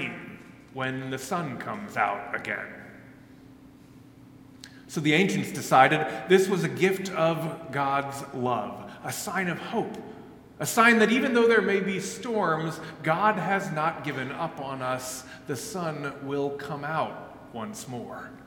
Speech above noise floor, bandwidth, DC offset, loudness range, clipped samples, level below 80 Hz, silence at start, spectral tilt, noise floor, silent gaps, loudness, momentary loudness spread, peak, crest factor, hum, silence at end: 24 dB; 17 kHz; under 0.1%; 9 LU; under 0.1%; -66 dBFS; 0 s; -4.5 dB/octave; -51 dBFS; none; -26 LUFS; 17 LU; -4 dBFS; 24 dB; none; 0 s